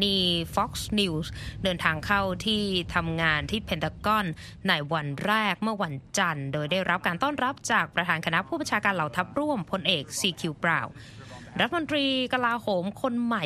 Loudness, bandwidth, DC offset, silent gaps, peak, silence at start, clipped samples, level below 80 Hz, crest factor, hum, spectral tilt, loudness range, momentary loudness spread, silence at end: -27 LUFS; 14 kHz; under 0.1%; none; -6 dBFS; 0 s; under 0.1%; -50 dBFS; 20 dB; none; -4 dB/octave; 1 LU; 5 LU; 0 s